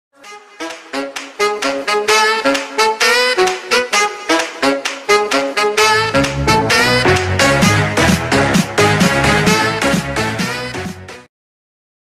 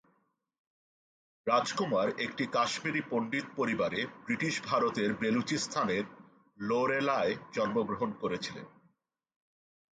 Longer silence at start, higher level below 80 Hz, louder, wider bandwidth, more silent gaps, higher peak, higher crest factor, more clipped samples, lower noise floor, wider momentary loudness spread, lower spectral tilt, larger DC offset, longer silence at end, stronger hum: second, 0.25 s vs 1.45 s; first, -36 dBFS vs -70 dBFS; first, -13 LUFS vs -32 LUFS; first, 15.5 kHz vs 9.4 kHz; neither; first, 0 dBFS vs -14 dBFS; second, 14 dB vs 20 dB; neither; second, -36 dBFS vs -76 dBFS; first, 12 LU vs 6 LU; about the same, -3.5 dB/octave vs -4.5 dB/octave; neither; second, 0.85 s vs 1.3 s; neither